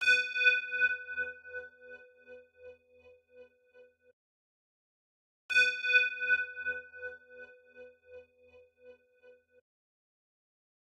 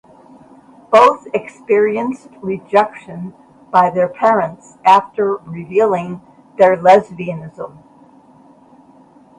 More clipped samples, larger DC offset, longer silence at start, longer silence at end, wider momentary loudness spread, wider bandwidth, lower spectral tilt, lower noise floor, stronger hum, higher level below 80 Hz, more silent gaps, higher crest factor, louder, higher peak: neither; neither; second, 0 s vs 0.9 s; first, 2.05 s vs 1.7 s; first, 26 LU vs 20 LU; about the same, 12 kHz vs 11 kHz; second, 0.5 dB/octave vs -6 dB/octave; first, -62 dBFS vs -46 dBFS; neither; second, -78 dBFS vs -60 dBFS; first, 4.13-5.49 s vs none; first, 24 dB vs 16 dB; second, -29 LUFS vs -15 LUFS; second, -12 dBFS vs 0 dBFS